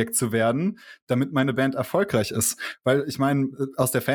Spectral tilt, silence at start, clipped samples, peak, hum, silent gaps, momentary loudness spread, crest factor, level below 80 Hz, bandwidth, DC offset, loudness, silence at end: -5 dB/octave; 0 s; under 0.1%; -6 dBFS; none; 1.02-1.07 s; 5 LU; 18 dB; -60 dBFS; 19.5 kHz; under 0.1%; -24 LUFS; 0 s